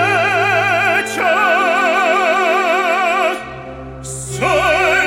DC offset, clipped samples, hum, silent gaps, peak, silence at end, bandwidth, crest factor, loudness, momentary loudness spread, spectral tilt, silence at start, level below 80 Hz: under 0.1%; under 0.1%; none; none; -2 dBFS; 0 s; 16.5 kHz; 14 dB; -14 LUFS; 14 LU; -3.5 dB/octave; 0 s; -42 dBFS